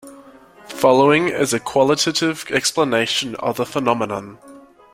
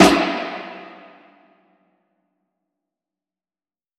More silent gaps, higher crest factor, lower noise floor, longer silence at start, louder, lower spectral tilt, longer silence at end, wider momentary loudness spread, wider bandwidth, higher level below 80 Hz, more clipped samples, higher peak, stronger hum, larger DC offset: neither; second, 18 dB vs 24 dB; second, -44 dBFS vs under -90 dBFS; about the same, 0.05 s vs 0 s; about the same, -18 LUFS vs -20 LUFS; about the same, -3.5 dB/octave vs -4 dB/octave; second, 0.35 s vs 3.15 s; second, 10 LU vs 25 LU; about the same, 16.5 kHz vs 16 kHz; second, -58 dBFS vs -50 dBFS; neither; about the same, -2 dBFS vs 0 dBFS; neither; neither